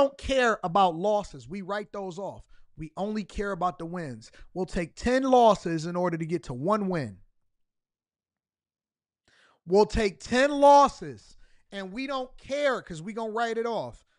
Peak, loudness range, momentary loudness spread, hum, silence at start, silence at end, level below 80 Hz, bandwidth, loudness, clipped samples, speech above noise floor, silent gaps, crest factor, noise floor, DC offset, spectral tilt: -8 dBFS; 10 LU; 19 LU; none; 0 s; 0.25 s; -48 dBFS; 11 kHz; -26 LUFS; under 0.1%; over 64 dB; none; 18 dB; under -90 dBFS; under 0.1%; -5.5 dB/octave